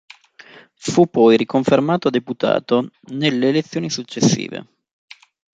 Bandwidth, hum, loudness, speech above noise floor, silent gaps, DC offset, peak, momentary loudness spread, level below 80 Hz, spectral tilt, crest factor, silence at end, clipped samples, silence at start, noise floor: 9.4 kHz; none; -18 LUFS; 28 dB; none; under 0.1%; -2 dBFS; 11 LU; -60 dBFS; -5.5 dB/octave; 16 dB; 0.95 s; under 0.1%; 0.85 s; -45 dBFS